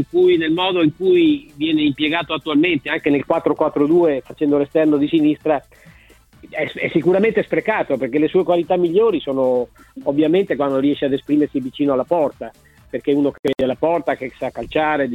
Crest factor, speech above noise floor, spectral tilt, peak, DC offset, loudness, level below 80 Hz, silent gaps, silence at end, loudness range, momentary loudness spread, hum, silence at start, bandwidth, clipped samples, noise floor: 16 dB; 31 dB; -7.5 dB/octave; -2 dBFS; under 0.1%; -18 LUFS; -52 dBFS; 13.39-13.43 s; 0 s; 3 LU; 8 LU; none; 0 s; 5.2 kHz; under 0.1%; -49 dBFS